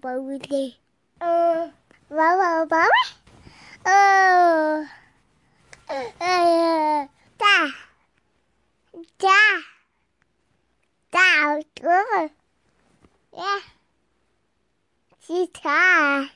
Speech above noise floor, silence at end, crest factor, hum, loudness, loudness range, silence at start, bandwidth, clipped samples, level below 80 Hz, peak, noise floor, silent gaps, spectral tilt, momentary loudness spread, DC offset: 52 dB; 0.05 s; 18 dB; none; -19 LUFS; 8 LU; 0.05 s; 11.5 kHz; under 0.1%; -68 dBFS; -6 dBFS; -72 dBFS; none; -2 dB/octave; 16 LU; under 0.1%